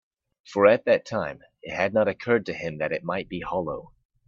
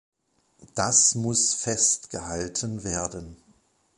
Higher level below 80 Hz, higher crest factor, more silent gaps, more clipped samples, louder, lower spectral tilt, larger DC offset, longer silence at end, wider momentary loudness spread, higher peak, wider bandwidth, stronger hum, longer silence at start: second, -60 dBFS vs -52 dBFS; about the same, 22 dB vs 22 dB; neither; neither; about the same, -25 LUFS vs -23 LUFS; first, -6.5 dB/octave vs -2.5 dB/octave; neither; second, 0.4 s vs 0.65 s; about the same, 15 LU vs 15 LU; about the same, -4 dBFS vs -4 dBFS; second, 7.4 kHz vs 11.5 kHz; neither; about the same, 0.5 s vs 0.6 s